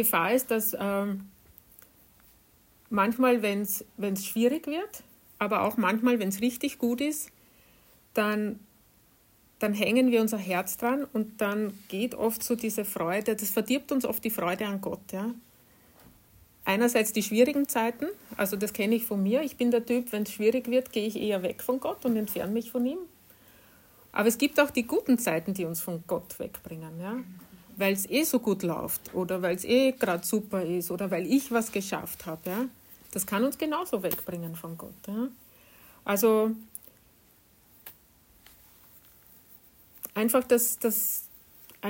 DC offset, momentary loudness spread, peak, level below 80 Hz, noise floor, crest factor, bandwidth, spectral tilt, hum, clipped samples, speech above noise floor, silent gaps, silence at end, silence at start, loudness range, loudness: under 0.1%; 13 LU; -10 dBFS; -66 dBFS; -62 dBFS; 20 dB; 16.5 kHz; -4.5 dB/octave; none; under 0.1%; 34 dB; none; 0 s; 0 s; 4 LU; -28 LUFS